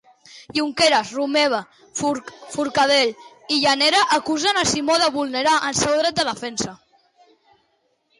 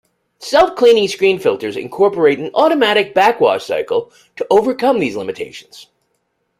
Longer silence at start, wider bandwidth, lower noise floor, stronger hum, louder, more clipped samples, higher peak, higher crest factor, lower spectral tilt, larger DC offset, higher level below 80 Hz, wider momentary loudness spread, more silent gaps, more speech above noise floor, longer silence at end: about the same, 0.35 s vs 0.4 s; second, 11.5 kHz vs 15 kHz; about the same, -67 dBFS vs -67 dBFS; neither; second, -19 LUFS vs -14 LUFS; neither; second, -6 dBFS vs 0 dBFS; about the same, 14 dB vs 14 dB; second, -2 dB/octave vs -4.5 dB/octave; neither; about the same, -56 dBFS vs -54 dBFS; about the same, 11 LU vs 13 LU; neither; second, 47 dB vs 53 dB; first, 1.45 s vs 0.75 s